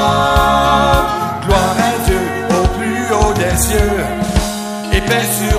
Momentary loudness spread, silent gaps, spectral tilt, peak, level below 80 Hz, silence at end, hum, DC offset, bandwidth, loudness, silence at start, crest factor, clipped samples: 6 LU; none; -4.5 dB/octave; 0 dBFS; -22 dBFS; 0 s; none; under 0.1%; 15.5 kHz; -14 LUFS; 0 s; 14 dB; under 0.1%